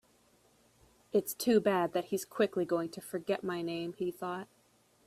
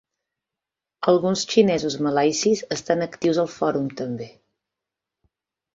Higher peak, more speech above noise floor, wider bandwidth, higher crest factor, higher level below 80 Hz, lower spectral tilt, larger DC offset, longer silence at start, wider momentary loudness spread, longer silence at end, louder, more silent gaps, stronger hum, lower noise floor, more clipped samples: second, -16 dBFS vs -4 dBFS; second, 36 dB vs 66 dB; first, 15.5 kHz vs 7.8 kHz; about the same, 18 dB vs 20 dB; second, -74 dBFS vs -62 dBFS; about the same, -5 dB/octave vs -4.5 dB/octave; neither; first, 1.15 s vs 1 s; about the same, 11 LU vs 11 LU; second, 0.6 s vs 1.45 s; second, -33 LUFS vs -22 LUFS; neither; neither; second, -68 dBFS vs -87 dBFS; neither